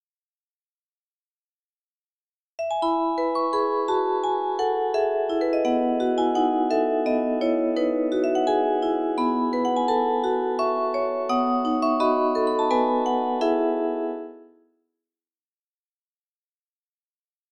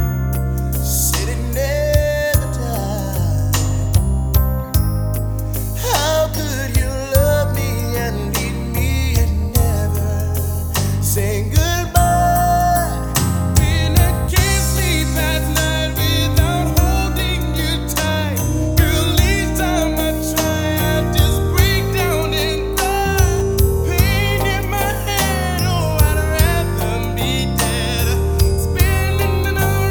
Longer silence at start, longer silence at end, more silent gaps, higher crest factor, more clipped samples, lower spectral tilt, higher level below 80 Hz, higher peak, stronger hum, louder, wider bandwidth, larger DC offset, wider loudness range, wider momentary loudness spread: first, 2.6 s vs 0 s; first, 3.1 s vs 0 s; neither; about the same, 14 dB vs 16 dB; neither; about the same, -4.5 dB/octave vs -4.5 dB/octave; second, -64 dBFS vs -22 dBFS; second, -10 dBFS vs 0 dBFS; neither; second, -23 LUFS vs -17 LUFS; second, 10 kHz vs over 20 kHz; neither; first, 6 LU vs 2 LU; about the same, 3 LU vs 5 LU